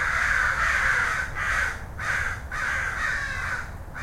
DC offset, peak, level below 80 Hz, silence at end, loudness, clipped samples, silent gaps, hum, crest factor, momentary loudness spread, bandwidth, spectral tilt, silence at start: under 0.1%; -10 dBFS; -38 dBFS; 0 s; -25 LUFS; under 0.1%; none; none; 16 dB; 8 LU; 16.5 kHz; -2.5 dB/octave; 0 s